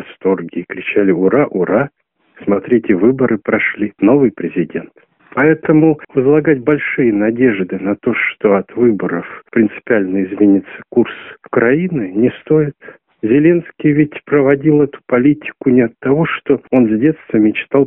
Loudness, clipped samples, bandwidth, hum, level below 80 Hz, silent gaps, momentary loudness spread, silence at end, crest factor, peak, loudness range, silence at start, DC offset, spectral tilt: -14 LUFS; under 0.1%; 3.6 kHz; none; -52 dBFS; none; 8 LU; 0 s; 14 dB; 0 dBFS; 2 LU; 0 s; under 0.1%; -11 dB/octave